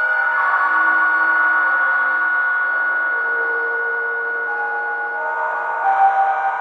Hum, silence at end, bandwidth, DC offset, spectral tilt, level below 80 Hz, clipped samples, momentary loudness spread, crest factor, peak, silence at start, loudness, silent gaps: none; 0 s; 5.6 kHz; under 0.1%; -3 dB/octave; -76 dBFS; under 0.1%; 6 LU; 14 dB; -4 dBFS; 0 s; -17 LUFS; none